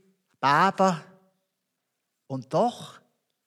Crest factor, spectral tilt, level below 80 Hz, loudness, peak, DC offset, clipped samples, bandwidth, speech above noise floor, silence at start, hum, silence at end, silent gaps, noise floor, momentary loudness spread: 20 dB; -5.5 dB/octave; under -90 dBFS; -24 LUFS; -8 dBFS; under 0.1%; under 0.1%; 13 kHz; 57 dB; 0.4 s; none; 0.55 s; none; -81 dBFS; 18 LU